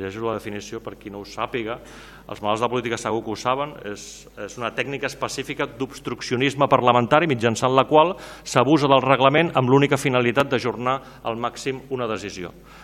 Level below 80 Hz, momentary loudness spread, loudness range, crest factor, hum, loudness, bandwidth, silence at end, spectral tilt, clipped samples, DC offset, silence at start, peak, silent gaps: -52 dBFS; 18 LU; 9 LU; 22 dB; none; -21 LUFS; 17 kHz; 0 s; -5 dB/octave; under 0.1%; under 0.1%; 0 s; 0 dBFS; none